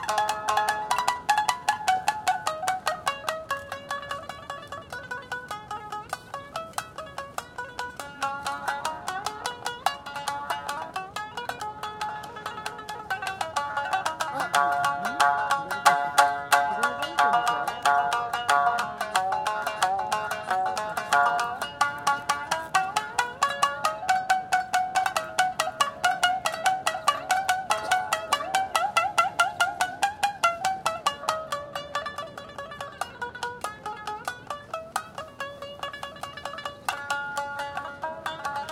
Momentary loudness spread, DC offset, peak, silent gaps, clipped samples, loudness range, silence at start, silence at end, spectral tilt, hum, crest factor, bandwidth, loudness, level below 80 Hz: 13 LU; under 0.1%; -4 dBFS; none; under 0.1%; 11 LU; 0 s; 0 s; -1.5 dB/octave; none; 24 dB; 17 kHz; -27 LUFS; -62 dBFS